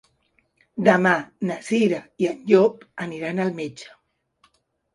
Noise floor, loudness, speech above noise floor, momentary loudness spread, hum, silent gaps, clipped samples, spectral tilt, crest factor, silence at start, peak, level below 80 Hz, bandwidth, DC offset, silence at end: -67 dBFS; -22 LUFS; 45 dB; 16 LU; none; none; under 0.1%; -6.5 dB/octave; 22 dB; 0.75 s; -2 dBFS; -68 dBFS; 11.5 kHz; under 0.1%; 1.1 s